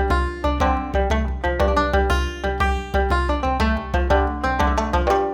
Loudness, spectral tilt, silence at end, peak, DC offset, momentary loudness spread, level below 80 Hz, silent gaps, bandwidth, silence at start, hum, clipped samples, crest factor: -21 LUFS; -6.5 dB/octave; 0 s; -6 dBFS; under 0.1%; 3 LU; -24 dBFS; none; 12 kHz; 0 s; none; under 0.1%; 14 dB